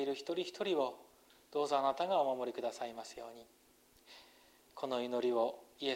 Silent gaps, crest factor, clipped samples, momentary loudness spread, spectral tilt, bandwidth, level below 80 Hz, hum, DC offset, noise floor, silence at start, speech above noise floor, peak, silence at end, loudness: none; 18 dB; under 0.1%; 24 LU; -4 dB/octave; 16 kHz; -80 dBFS; none; under 0.1%; -65 dBFS; 0 s; 28 dB; -20 dBFS; 0 s; -37 LUFS